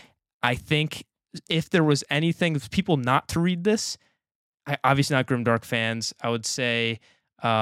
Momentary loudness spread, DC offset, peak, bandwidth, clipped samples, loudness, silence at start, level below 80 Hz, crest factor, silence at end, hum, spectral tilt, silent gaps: 10 LU; under 0.1%; -4 dBFS; 15.5 kHz; under 0.1%; -24 LUFS; 0.45 s; -56 dBFS; 22 dB; 0 s; none; -5 dB/octave; 4.35-4.58 s